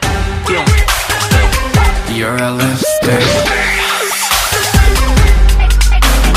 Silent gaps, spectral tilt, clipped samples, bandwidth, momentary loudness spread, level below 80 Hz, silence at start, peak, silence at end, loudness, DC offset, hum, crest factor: none; -4 dB/octave; under 0.1%; 16 kHz; 4 LU; -12 dBFS; 0 s; 0 dBFS; 0 s; -12 LUFS; under 0.1%; none; 10 dB